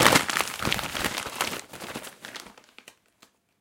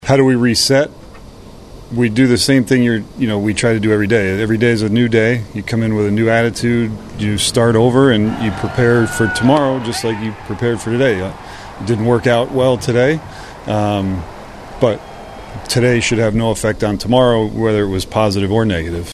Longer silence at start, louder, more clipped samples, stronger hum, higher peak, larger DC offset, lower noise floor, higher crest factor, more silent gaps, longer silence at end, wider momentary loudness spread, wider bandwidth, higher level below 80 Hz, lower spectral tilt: about the same, 0 s vs 0 s; second, -27 LUFS vs -15 LUFS; neither; neither; about the same, -2 dBFS vs 0 dBFS; neither; first, -62 dBFS vs -36 dBFS; first, 28 dB vs 14 dB; neither; first, 1.1 s vs 0 s; first, 18 LU vs 11 LU; first, 17 kHz vs 13.5 kHz; second, -54 dBFS vs -38 dBFS; second, -2 dB/octave vs -5.5 dB/octave